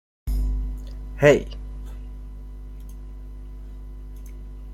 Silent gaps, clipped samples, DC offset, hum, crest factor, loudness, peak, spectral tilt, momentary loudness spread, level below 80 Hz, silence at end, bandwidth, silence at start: none; under 0.1%; under 0.1%; 50 Hz at -35 dBFS; 24 dB; -23 LUFS; -2 dBFS; -6.5 dB/octave; 23 LU; -32 dBFS; 0 s; 14.5 kHz; 0.25 s